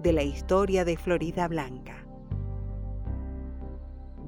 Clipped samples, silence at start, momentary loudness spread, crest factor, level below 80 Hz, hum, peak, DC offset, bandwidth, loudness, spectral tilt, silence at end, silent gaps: under 0.1%; 0 s; 17 LU; 18 dB; -38 dBFS; none; -12 dBFS; under 0.1%; 16 kHz; -30 LUFS; -7 dB/octave; 0 s; none